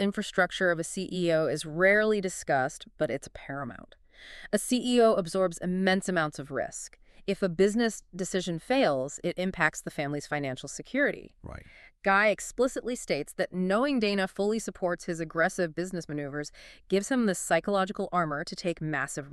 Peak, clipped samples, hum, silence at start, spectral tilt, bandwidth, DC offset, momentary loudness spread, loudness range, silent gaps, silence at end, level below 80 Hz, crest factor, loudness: -8 dBFS; under 0.1%; none; 0 s; -4.5 dB/octave; 13.5 kHz; under 0.1%; 13 LU; 2 LU; none; 0 s; -58 dBFS; 20 dB; -29 LUFS